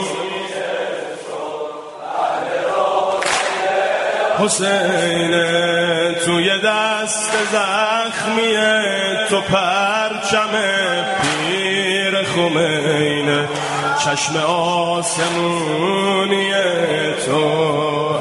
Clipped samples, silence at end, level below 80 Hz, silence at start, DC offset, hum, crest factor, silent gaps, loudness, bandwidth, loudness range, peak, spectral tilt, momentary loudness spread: under 0.1%; 0 s; -58 dBFS; 0 s; under 0.1%; none; 16 dB; none; -17 LUFS; 11.5 kHz; 2 LU; -2 dBFS; -3 dB/octave; 7 LU